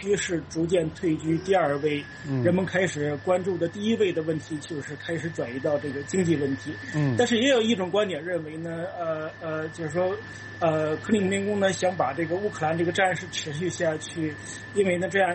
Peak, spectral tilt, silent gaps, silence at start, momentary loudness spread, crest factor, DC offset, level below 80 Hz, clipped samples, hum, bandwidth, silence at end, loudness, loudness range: -10 dBFS; -5 dB/octave; none; 0 s; 9 LU; 16 dB; under 0.1%; -60 dBFS; under 0.1%; none; 8.8 kHz; 0 s; -26 LUFS; 3 LU